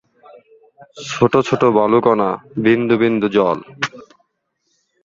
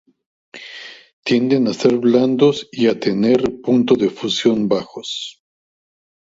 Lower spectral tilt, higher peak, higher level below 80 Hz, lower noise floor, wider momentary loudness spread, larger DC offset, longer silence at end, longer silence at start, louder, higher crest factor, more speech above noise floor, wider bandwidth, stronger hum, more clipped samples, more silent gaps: about the same, -6 dB/octave vs -5.5 dB/octave; about the same, -2 dBFS vs 0 dBFS; about the same, -54 dBFS vs -58 dBFS; first, -69 dBFS vs -37 dBFS; second, 11 LU vs 18 LU; neither; first, 1.05 s vs 0.9 s; first, 0.95 s vs 0.55 s; about the same, -16 LUFS vs -17 LUFS; about the same, 16 dB vs 18 dB; first, 54 dB vs 21 dB; about the same, 7.6 kHz vs 7.8 kHz; neither; neither; second, none vs 1.13-1.23 s